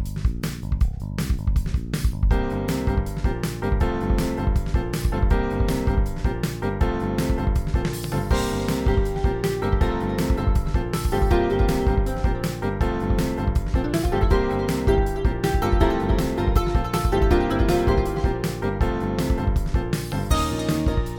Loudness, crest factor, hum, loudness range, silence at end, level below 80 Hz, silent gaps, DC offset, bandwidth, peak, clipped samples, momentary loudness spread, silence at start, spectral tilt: -23 LUFS; 16 dB; none; 3 LU; 0 s; -24 dBFS; none; under 0.1%; 19 kHz; -4 dBFS; under 0.1%; 5 LU; 0 s; -6.5 dB/octave